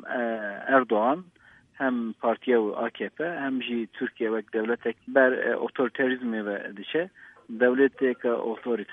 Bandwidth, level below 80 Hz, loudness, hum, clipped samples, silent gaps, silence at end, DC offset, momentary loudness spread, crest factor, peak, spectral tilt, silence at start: 3.8 kHz; -78 dBFS; -27 LUFS; none; under 0.1%; none; 0 s; under 0.1%; 10 LU; 20 dB; -6 dBFS; -7.5 dB/octave; 0.05 s